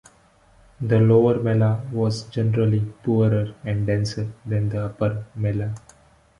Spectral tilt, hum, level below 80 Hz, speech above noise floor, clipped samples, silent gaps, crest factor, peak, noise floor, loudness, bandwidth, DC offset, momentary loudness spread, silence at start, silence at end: -8.5 dB/octave; none; -50 dBFS; 35 dB; under 0.1%; none; 16 dB; -6 dBFS; -56 dBFS; -22 LUFS; 10.5 kHz; under 0.1%; 10 LU; 0.8 s; 0.6 s